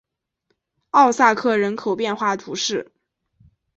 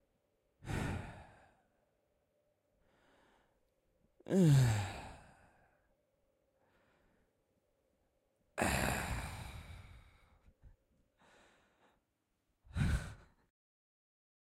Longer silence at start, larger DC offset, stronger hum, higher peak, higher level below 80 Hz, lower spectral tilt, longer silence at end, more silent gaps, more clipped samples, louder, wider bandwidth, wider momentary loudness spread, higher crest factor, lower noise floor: first, 0.95 s vs 0.65 s; neither; neither; first, -2 dBFS vs -20 dBFS; second, -66 dBFS vs -54 dBFS; second, -3.5 dB/octave vs -6 dB/octave; second, 0.95 s vs 1.35 s; neither; neither; first, -19 LUFS vs -36 LUFS; second, 8.2 kHz vs 15.5 kHz; second, 9 LU vs 25 LU; about the same, 20 dB vs 22 dB; second, -72 dBFS vs -84 dBFS